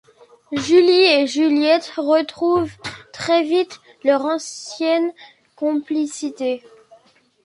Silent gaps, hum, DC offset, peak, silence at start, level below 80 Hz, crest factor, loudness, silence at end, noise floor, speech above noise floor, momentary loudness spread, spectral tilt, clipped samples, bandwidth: none; none; under 0.1%; -2 dBFS; 0.5 s; -60 dBFS; 16 dB; -18 LUFS; 0.85 s; -55 dBFS; 36 dB; 15 LU; -3.5 dB/octave; under 0.1%; 11.5 kHz